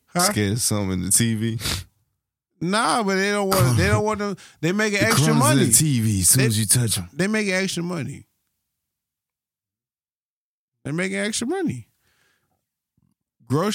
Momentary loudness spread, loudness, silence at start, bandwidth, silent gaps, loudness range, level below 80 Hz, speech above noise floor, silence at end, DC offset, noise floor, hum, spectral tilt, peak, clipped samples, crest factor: 13 LU; -20 LUFS; 0.15 s; 16.5 kHz; 10.12-10.72 s; 12 LU; -48 dBFS; over 70 dB; 0 s; under 0.1%; under -90 dBFS; none; -4 dB/octave; -2 dBFS; under 0.1%; 20 dB